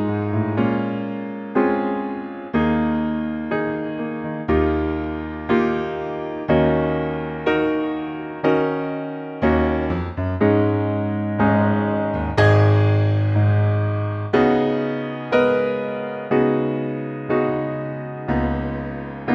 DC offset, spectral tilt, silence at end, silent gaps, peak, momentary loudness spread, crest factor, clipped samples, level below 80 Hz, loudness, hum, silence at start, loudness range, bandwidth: under 0.1%; -9 dB/octave; 0 s; none; -4 dBFS; 10 LU; 16 dB; under 0.1%; -38 dBFS; -21 LUFS; none; 0 s; 4 LU; 6.2 kHz